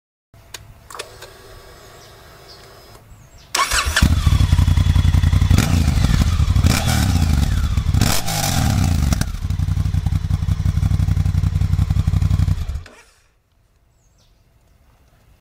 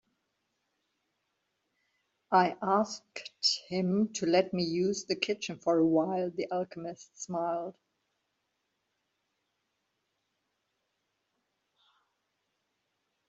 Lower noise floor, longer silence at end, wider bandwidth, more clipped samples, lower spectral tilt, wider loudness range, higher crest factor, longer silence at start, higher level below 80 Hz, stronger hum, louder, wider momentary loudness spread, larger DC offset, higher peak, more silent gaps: second, -58 dBFS vs -81 dBFS; second, 2.55 s vs 5.6 s; first, 16 kHz vs 8 kHz; neither; about the same, -5 dB/octave vs -4.5 dB/octave; second, 9 LU vs 12 LU; second, 18 dB vs 24 dB; second, 0.55 s vs 2.3 s; first, -22 dBFS vs -76 dBFS; neither; first, -18 LUFS vs -30 LUFS; first, 17 LU vs 13 LU; neither; first, 0 dBFS vs -10 dBFS; neither